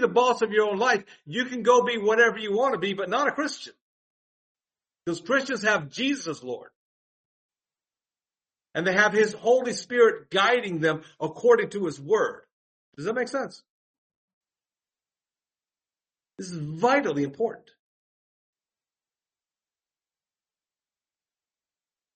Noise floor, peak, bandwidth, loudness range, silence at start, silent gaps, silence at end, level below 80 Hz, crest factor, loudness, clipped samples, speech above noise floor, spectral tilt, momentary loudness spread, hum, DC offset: under -90 dBFS; -6 dBFS; 8.4 kHz; 13 LU; 0 s; 3.81-4.55 s, 6.76-7.49 s, 12.52-12.92 s, 13.70-14.10 s, 14.16-14.41 s; 4.6 s; -74 dBFS; 22 dB; -24 LUFS; under 0.1%; over 66 dB; -4 dB/octave; 14 LU; none; under 0.1%